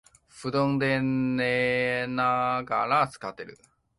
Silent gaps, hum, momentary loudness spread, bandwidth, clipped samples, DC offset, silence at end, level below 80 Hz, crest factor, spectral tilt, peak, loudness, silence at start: none; none; 13 LU; 11.5 kHz; under 0.1%; under 0.1%; 0.45 s; -62 dBFS; 16 dB; -6.5 dB/octave; -12 dBFS; -26 LUFS; 0.35 s